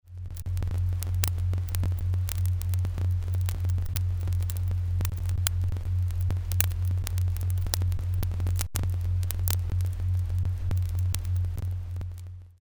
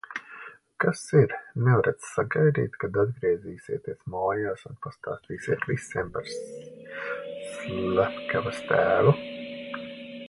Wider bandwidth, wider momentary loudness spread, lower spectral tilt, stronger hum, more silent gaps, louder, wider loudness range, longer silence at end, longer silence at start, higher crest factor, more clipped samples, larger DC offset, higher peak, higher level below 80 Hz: first, over 20 kHz vs 11.5 kHz; second, 4 LU vs 15 LU; second, -5 dB/octave vs -6.5 dB/octave; neither; neither; about the same, -29 LUFS vs -27 LUFS; second, 1 LU vs 7 LU; about the same, 0.1 s vs 0 s; about the same, 0.05 s vs 0.1 s; about the same, 24 dB vs 22 dB; neither; neither; first, -2 dBFS vs -6 dBFS; first, -36 dBFS vs -58 dBFS